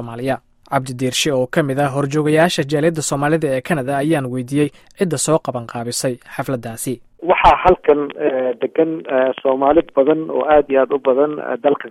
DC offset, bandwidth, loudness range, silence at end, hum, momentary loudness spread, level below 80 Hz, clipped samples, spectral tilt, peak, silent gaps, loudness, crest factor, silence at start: under 0.1%; 16 kHz; 4 LU; 0 s; none; 10 LU; -42 dBFS; under 0.1%; -5 dB/octave; 0 dBFS; none; -17 LUFS; 16 dB; 0 s